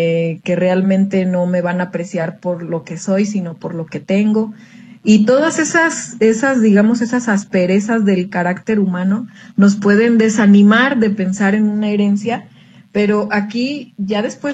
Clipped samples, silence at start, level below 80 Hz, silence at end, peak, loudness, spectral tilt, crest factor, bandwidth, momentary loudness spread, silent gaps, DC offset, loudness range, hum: under 0.1%; 0 s; -60 dBFS; 0 s; 0 dBFS; -15 LUFS; -6 dB/octave; 14 dB; 9 kHz; 11 LU; none; under 0.1%; 6 LU; none